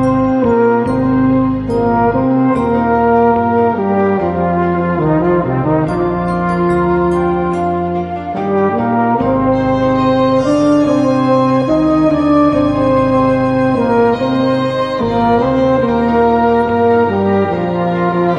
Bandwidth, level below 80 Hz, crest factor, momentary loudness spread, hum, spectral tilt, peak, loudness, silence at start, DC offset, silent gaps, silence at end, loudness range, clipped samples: 10.5 kHz; -36 dBFS; 12 dB; 4 LU; none; -8.5 dB/octave; 0 dBFS; -13 LUFS; 0 s; under 0.1%; none; 0 s; 3 LU; under 0.1%